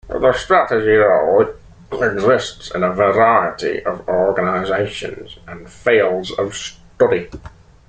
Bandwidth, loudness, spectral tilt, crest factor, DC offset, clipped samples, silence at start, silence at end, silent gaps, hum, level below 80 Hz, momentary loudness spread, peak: 9.2 kHz; -16 LUFS; -5 dB/octave; 16 dB; under 0.1%; under 0.1%; 0.05 s; 0.4 s; none; none; -44 dBFS; 17 LU; -2 dBFS